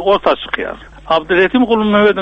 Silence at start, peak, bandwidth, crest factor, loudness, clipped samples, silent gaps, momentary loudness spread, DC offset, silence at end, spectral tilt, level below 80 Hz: 0 s; 0 dBFS; 6.8 kHz; 12 dB; -14 LUFS; under 0.1%; none; 11 LU; under 0.1%; 0 s; -7 dB/octave; -40 dBFS